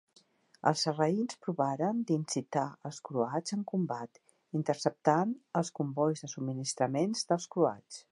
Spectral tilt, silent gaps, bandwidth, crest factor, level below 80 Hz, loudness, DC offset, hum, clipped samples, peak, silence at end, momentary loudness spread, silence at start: -5.5 dB/octave; none; 11.5 kHz; 22 dB; -82 dBFS; -33 LUFS; under 0.1%; none; under 0.1%; -12 dBFS; 0.1 s; 8 LU; 0.65 s